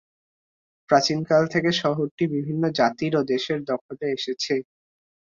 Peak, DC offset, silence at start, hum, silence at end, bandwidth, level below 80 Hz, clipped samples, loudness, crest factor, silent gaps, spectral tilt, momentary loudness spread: -6 dBFS; under 0.1%; 0.9 s; none; 0.75 s; 7.6 kHz; -64 dBFS; under 0.1%; -23 LUFS; 20 dB; 2.11-2.18 s, 3.81-3.89 s; -5 dB/octave; 8 LU